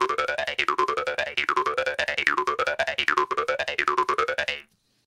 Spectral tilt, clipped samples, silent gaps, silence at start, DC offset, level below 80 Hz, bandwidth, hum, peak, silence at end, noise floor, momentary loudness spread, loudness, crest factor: -2 dB/octave; under 0.1%; none; 0 s; under 0.1%; -58 dBFS; 14.5 kHz; none; -2 dBFS; 0.45 s; -48 dBFS; 3 LU; -24 LUFS; 22 dB